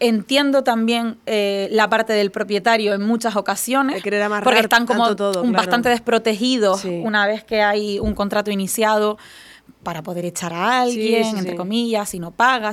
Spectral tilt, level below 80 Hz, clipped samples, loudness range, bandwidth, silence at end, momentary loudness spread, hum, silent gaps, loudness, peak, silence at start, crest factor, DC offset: -4 dB/octave; -48 dBFS; under 0.1%; 4 LU; 16 kHz; 0 s; 7 LU; none; none; -18 LUFS; 0 dBFS; 0 s; 18 dB; under 0.1%